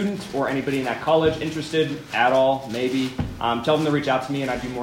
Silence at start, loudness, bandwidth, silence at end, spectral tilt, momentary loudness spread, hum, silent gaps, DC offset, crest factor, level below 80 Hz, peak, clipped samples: 0 s; -22 LUFS; 16 kHz; 0 s; -5.5 dB/octave; 6 LU; none; none; under 0.1%; 18 dB; -48 dBFS; -4 dBFS; under 0.1%